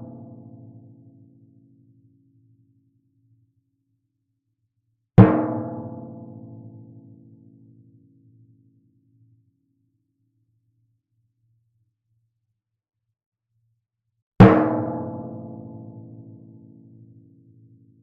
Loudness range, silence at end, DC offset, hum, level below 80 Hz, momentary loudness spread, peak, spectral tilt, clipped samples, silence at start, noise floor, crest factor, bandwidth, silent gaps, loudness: 15 LU; 2.05 s; under 0.1%; none; -46 dBFS; 30 LU; 0 dBFS; -8.5 dB/octave; under 0.1%; 0 s; -79 dBFS; 26 dB; 4.6 kHz; 13.26-13.32 s, 14.22-14.32 s; -18 LUFS